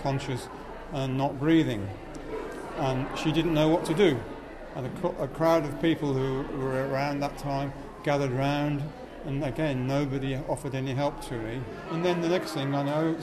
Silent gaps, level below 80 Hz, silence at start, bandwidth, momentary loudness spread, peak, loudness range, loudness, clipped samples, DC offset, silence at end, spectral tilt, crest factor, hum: none; -46 dBFS; 0 s; 13.5 kHz; 12 LU; -10 dBFS; 3 LU; -29 LUFS; under 0.1%; under 0.1%; 0 s; -6.5 dB/octave; 18 dB; none